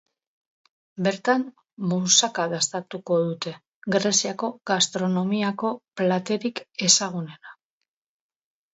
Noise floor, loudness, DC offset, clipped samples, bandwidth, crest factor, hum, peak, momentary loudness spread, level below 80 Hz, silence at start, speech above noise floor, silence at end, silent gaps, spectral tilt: -84 dBFS; -23 LUFS; under 0.1%; under 0.1%; 8.2 kHz; 22 dB; none; -4 dBFS; 15 LU; -72 dBFS; 0.95 s; 60 dB; 1.2 s; 1.73-1.77 s, 3.68-3.82 s; -3 dB/octave